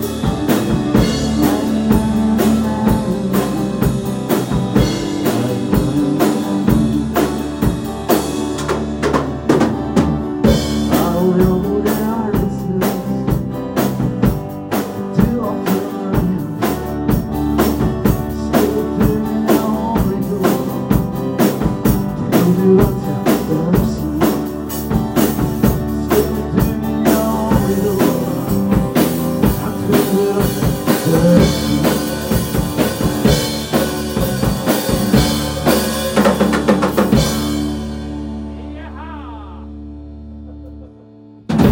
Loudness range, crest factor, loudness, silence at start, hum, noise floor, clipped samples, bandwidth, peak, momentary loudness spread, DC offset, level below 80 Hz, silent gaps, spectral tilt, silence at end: 3 LU; 16 dB; -16 LUFS; 0 s; none; -40 dBFS; under 0.1%; 17 kHz; 0 dBFS; 7 LU; under 0.1%; -30 dBFS; none; -6 dB/octave; 0 s